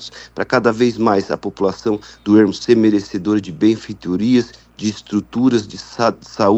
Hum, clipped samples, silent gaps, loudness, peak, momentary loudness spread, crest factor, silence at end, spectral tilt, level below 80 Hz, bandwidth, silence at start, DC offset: none; under 0.1%; none; -17 LUFS; 0 dBFS; 10 LU; 16 dB; 0 s; -6 dB/octave; -52 dBFS; 8.2 kHz; 0 s; under 0.1%